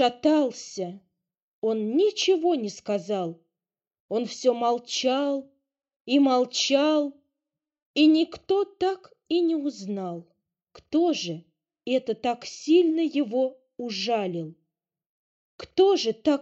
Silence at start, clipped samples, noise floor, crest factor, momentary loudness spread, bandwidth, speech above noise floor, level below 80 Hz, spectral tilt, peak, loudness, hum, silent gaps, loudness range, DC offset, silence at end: 0 s; under 0.1%; under -90 dBFS; 16 dB; 13 LU; 8 kHz; over 66 dB; -70 dBFS; -4 dB/octave; -8 dBFS; -25 LUFS; none; 1.42-1.62 s, 3.87-3.91 s, 4.00-4.09 s, 5.96-6.05 s, 7.82-7.94 s, 15.06-15.58 s; 4 LU; under 0.1%; 0 s